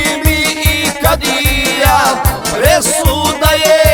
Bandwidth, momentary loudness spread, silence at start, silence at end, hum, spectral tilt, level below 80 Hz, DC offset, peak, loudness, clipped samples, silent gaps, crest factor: 20 kHz; 3 LU; 0 s; 0 s; none; -3.5 dB/octave; -20 dBFS; under 0.1%; 0 dBFS; -11 LUFS; 0.2%; none; 12 dB